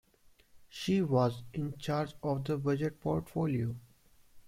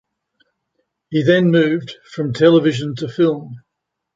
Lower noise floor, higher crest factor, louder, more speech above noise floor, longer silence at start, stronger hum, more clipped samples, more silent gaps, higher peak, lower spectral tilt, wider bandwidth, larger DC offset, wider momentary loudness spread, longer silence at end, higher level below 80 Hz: second, -64 dBFS vs -78 dBFS; about the same, 18 dB vs 16 dB; second, -34 LUFS vs -16 LUFS; second, 32 dB vs 62 dB; second, 0.55 s vs 1.1 s; neither; neither; neither; second, -16 dBFS vs -2 dBFS; about the same, -7.5 dB/octave vs -7.5 dB/octave; first, 16 kHz vs 7.8 kHz; neither; second, 10 LU vs 14 LU; second, 0 s vs 0.6 s; about the same, -62 dBFS vs -60 dBFS